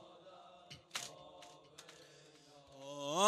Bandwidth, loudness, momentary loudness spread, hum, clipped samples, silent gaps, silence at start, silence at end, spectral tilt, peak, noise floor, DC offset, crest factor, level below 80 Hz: 13.5 kHz; -50 LUFS; 15 LU; none; under 0.1%; none; 0 s; 0 s; -2 dB/octave; -16 dBFS; -62 dBFS; under 0.1%; 28 dB; -84 dBFS